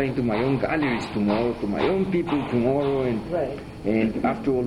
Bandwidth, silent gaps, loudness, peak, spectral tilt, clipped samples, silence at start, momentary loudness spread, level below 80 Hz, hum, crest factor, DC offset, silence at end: 11.5 kHz; none; -24 LUFS; -10 dBFS; -8 dB/octave; under 0.1%; 0 s; 4 LU; -46 dBFS; none; 14 dB; under 0.1%; 0 s